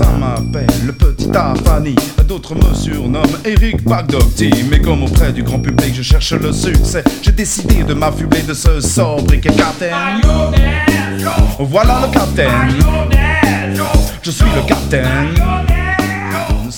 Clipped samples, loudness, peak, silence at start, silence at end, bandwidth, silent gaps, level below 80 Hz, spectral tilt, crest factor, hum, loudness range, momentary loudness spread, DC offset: 0.3%; -13 LUFS; 0 dBFS; 0 s; 0 s; 18 kHz; none; -16 dBFS; -5.5 dB/octave; 12 dB; none; 1 LU; 4 LU; under 0.1%